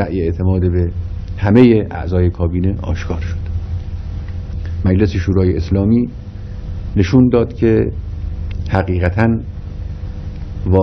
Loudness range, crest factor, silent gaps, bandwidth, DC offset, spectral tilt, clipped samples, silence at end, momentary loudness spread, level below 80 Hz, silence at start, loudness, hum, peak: 4 LU; 16 dB; none; 6.4 kHz; under 0.1%; -9 dB/octave; 0.1%; 0 s; 16 LU; -26 dBFS; 0 s; -16 LUFS; none; 0 dBFS